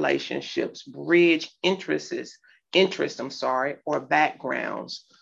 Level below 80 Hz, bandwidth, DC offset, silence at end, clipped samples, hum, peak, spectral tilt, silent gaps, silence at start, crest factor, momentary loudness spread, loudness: -74 dBFS; 7.6 kHz; under 0.1%; 0.25 s; under 0.1%; none; -6 dBFS; -4.5 dB/octave; none; 0 s; 20 dB; 14 LU; -25 LUFS